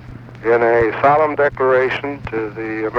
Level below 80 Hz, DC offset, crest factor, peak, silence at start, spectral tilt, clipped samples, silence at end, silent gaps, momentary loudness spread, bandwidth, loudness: -44 dBFS; under 0.1%; 14 dB; -4 dBFS; 0 s; -7.5 dB/octave; under 0.1%; 0 s; none; 10 LU; 6.6 kHz; -16 LUFS